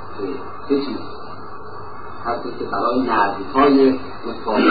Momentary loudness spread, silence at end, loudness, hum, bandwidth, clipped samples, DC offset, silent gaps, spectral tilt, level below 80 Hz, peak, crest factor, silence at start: 20 LU; 0 s; -20 LUFS; none; 4.9 kHz; under 0.1%; 3%; none; -10.5 dB/octave; -48 dBFS; -4 dBFS; 16 dB; 0 s